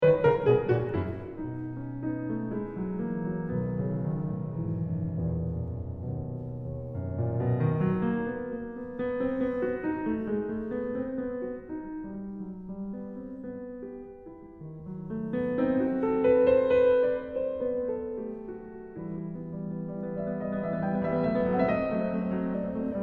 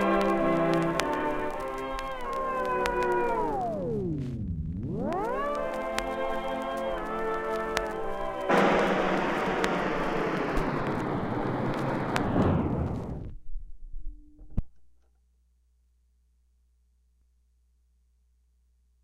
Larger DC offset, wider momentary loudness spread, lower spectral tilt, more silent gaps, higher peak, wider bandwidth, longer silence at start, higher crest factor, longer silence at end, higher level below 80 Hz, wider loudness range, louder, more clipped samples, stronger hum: neither; first, 15 LU vs 12 LU; first, -11 dB/octave vs -6.5 dB/octave; neither; second, -10 dBFS vs -4 dBFS; second, 4.3 kHz vs 16.5 kHz; about the same, 0 s vs 0 s; second, 18 dB vs 24 dB; second, 0 s vs 4.15 s; second, -52 dBFS vs -42 dBFS; second, 10 LU vs 17 LU; about the same, -30 LUFS vs -29 LUFS; neither; neither